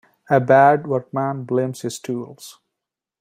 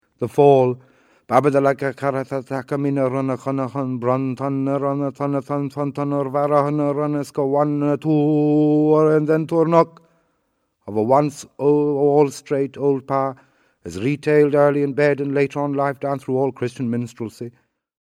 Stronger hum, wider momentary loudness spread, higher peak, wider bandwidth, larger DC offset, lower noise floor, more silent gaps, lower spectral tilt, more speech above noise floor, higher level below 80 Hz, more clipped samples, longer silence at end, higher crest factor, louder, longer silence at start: neither; first, 15 LU vs 10 LU; about the same, -2 dBFS vs 0 dBFS; first, 15.5 kHz vs 12 kHz; neither; first, -84 dBFS vs -70 dBFS; neither; second, -6.5 dB/octave vs -8 dB/octave; first, 65 dB vs 51 dB; about the same, -64 dBFS vs -66 dBFS; neither; first, 0.7 s vs 0.5 s; about the same, 18 dB vs 18 dB; about the same, -19 LUFS vs -19 LUFS; about the same, 0.3 s vs 0.2 s